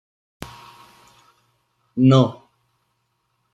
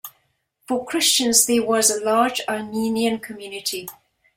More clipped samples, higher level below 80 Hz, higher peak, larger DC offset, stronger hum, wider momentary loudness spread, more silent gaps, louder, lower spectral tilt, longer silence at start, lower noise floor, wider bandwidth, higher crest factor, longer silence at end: neither; about the same, -58 dBFS vs -62 dBFS; about the same, -4 dBFS vs -2 dBFS; neither; neither; first, 25 LU vs 15 LU; neither; about the same, -18 LUFS vs -19 LUFS; first, -8 dB/octave vs -1.5 dB/octave; first, 1.95 s vs 0.05 s; first, -71 dBFS vs -67 dBFS; second, 8.8 kHz vs 16.5 kHz; about the same, 20 dB vs 20 dB; first, 1.2 s vs 0.45 s